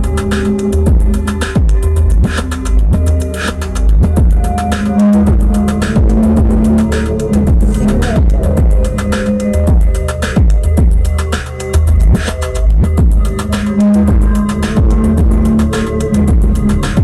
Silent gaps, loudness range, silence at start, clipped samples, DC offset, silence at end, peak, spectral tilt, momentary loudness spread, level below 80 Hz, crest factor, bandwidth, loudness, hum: none; 2 LU; 0 s; under 0.1%; under 0.1%; 0 s; -2 dBFS; -7 dB/octave; 5 LU; -12 dBFS; 8 dB; 13 kHz; -12 LUFS; none